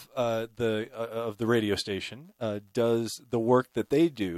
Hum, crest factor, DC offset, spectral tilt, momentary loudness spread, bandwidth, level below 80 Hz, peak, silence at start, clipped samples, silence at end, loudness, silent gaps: none; 20 dB; under 0.1%; -5.5 dB/octave; 9 LU; 15 kHz; -64 dBFS; -8 dBFS; 0 s; under 0.1%; 0 s; -29 LUFS; none